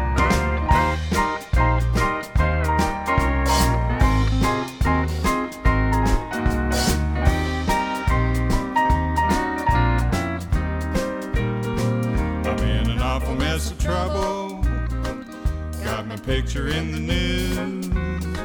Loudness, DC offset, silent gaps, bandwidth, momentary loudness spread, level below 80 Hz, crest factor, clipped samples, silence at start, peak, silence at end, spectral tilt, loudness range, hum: -22 LUFS; under 0.1%; none; over 20 kHz; 6 LU; -24 dBFS; 16 dB; under 0.1%; 0 s; -4 dBFS; 0 s; -5.5 dB/octave; 5 LU; none